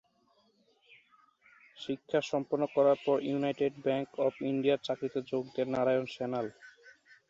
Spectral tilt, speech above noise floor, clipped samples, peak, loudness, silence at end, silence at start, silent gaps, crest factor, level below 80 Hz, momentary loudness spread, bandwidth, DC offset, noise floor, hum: -6.5 dB/octave; 39 dB; under 0.1%; -16 dBFS; -32 LUFS; 0.4 s; 1.75 s; none; 18 dB; -76 dBFS; 9 LU; 7.8 kHz; under 0.1%; -70 dBFS; none